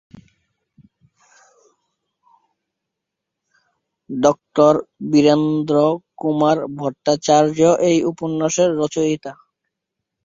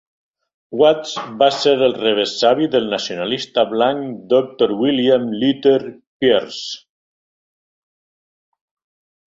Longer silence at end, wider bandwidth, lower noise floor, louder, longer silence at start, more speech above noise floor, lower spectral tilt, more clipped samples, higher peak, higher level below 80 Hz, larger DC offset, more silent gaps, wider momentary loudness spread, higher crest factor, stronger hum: second, 0.9 s vs 2.5 s; about the same, 7.8 kHz vs 7.8 kHz; second, -81 dBFS vs under -90 dBFS; about the same, -17 LUFS vs -17 LUFS; second, 0.15 s vs 0.7 s; second, 65 dB vs over 73 dB; about the same, -5.5 dB/octave vs -4.5 dB/octave; neither; about the same, -2 dBFS vs -2 dBFS; about the same, -60 dBFS vs -60 dBFS; neither; second, none vs 6.07-6.20 s; about the same, 9 LU vs 11 LU; about the same, 18 dB vs 18 dB; neither